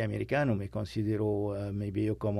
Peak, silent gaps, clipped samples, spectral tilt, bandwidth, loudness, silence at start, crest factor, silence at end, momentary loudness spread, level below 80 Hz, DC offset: -16 dBFS; none; under 0.1%; -8.5 dB/octave; 12 kHz; -32 LUFS; 0 s; 14 dB; 0 s; 5 LU; -54 dBFS; under 0.1%